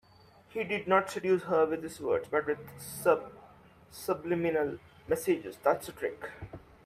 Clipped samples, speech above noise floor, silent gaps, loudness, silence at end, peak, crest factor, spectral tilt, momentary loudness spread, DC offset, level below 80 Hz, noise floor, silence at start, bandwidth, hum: under 0.1%; 28 dB; none; -31 LUFS; 0.25 s; -12 dBFS; 20 dB; -5.5 dB/octave; 16 LU; under 0.1%; -64 dBFS; -59 dBFS; 0.5 s; 16 kHz; none